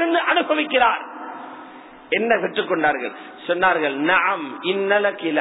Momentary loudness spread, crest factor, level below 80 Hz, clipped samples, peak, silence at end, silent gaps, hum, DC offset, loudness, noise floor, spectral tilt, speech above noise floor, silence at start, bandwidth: 16 LU; 16 dB; -60 dBFS; under 0.1%; -4 dBFS; 0 s; none; none; under 0.1%; -20 LUFS; -41 dBFS; -7.5 dB/octave; 21 dB; 0 s; 4.1 kHz